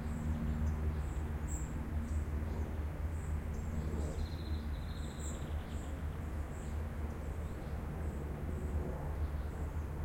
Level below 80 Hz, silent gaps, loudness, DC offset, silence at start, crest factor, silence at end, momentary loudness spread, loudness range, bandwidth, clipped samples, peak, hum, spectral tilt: -42 dBFS; none; -41 LUFS; under 0.1%; 0 s; 12 dB; 0 s; 4 LU; 3 LU; 16.5 kHz; under 0.1%; -26 dBFS; none; -7 dB/octave